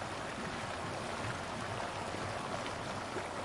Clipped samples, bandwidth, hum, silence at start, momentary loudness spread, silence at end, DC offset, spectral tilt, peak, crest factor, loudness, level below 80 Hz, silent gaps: under 0.1%; 11.5 kHz; none; 0 s; 1 LU; 0 s; under 0.1%; -4 dB/octave; -24 dBFS; 16 dB; -40 LUFS; -60 dBFS; none